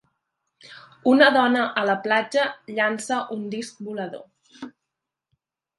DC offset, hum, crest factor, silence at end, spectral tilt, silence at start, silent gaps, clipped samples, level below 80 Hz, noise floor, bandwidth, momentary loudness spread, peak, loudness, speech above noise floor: under 0.1%; none; 24 dB; 1.1 s; -4 dB/octave; 0.65 s; none; under 0.1%; -76 dBFS; -84 dBFS; 11.5 kHz; 25 LU; 0 dBFS; -22 LUFS; 62 dB